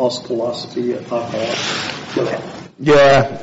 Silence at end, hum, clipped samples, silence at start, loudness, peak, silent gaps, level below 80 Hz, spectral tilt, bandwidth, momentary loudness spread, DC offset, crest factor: 0 s; none; under 0.1%; 0 s; -17 LUFS; -4 dBFS; none; -48 dBFS; -3.5 dB/octave; 8 kHz; 12 LU; under 0.1%; 12 dB